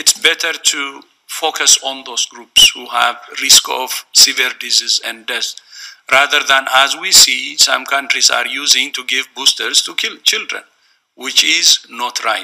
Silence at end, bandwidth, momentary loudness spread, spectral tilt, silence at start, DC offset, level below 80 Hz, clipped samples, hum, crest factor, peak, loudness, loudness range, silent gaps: 0 s; over 20 kHz; 12 LU; 2.5 dB/octave; 0 s; under 0.1%; -54 dBFS; 0.1%; none; 14 dB; 0 dBFS; -11 LUFS; 3 LU; none